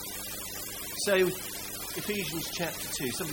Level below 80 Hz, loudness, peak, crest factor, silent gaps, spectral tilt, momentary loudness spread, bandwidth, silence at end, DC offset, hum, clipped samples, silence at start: -56 dBFS; -32 LUFS; -12 dBFS; 20 dB; none; -3 dB/octave; 9 LU; 17 kHz; 0 s; under 0.1%; 50 Hz at -55 dBFS; under 0.1%; 0 s